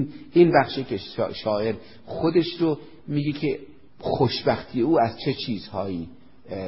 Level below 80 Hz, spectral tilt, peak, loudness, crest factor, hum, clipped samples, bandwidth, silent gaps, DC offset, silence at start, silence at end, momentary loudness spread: -54 dBFS; -10.5 dB/octave; -4 dBFS; -24 LUFS; 20 dB; none; under 0.1%; 5.8 kHz; none; 0.4%; 0 s; 0 s; 15 LU